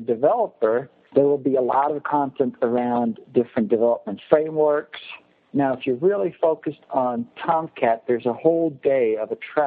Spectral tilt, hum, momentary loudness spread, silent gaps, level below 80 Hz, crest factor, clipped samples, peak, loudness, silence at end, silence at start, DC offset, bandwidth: -10.5 dB/octave; none; 7 LU; none; -70 dBFS; 20 dB; under 0.1%; 0 dBFS; -22 LUFS; 0 s; 0 s; under 0.1%; 4.5 kHz